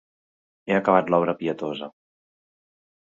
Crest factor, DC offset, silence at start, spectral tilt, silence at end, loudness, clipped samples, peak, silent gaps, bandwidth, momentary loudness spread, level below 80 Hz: 22 dB; under 0.1%; 0.65 s; -7.5 dB/octave; 1.15 s; -23 LUFS; under 0.1%; -4 dBFS; none; 7.4 kHz; 18 LU; -68 dBFS